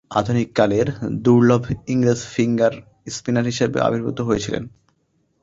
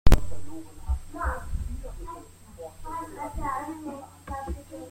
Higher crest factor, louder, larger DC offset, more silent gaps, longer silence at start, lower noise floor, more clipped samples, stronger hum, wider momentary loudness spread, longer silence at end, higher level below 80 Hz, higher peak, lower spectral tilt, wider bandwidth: about the same, 18 dB vs 22 dB; first, -20 LUFS vs -34 LUFS; neither; neither; about the same, 0.1 s vs 0.05 s; first, -66 dBFS vs -45 dBFS; neither; neither; about the same, 12 LU vs 12 LU; first, 0.75 s vs 0 s; second, -48 dBFS vs -30 dBFS; about the same, -2 dBFS vs -2 dBFS; about the same, -6.5 dB/octave vs -6 dB/octave; second, 7.8 kHz vs 16 kHz